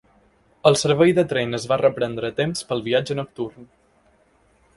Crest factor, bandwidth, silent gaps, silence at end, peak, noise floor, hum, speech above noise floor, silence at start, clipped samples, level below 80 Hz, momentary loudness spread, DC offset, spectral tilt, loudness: 22 dB; 11.5 kHz; none; 1.15 s; 0 dBFS; -59 dBFS; none; 39 dB; 0.65 s; under 0.1%; -58 dBFS; 11 LU; under 0.1%; -5 dB/octave; -21 LUFS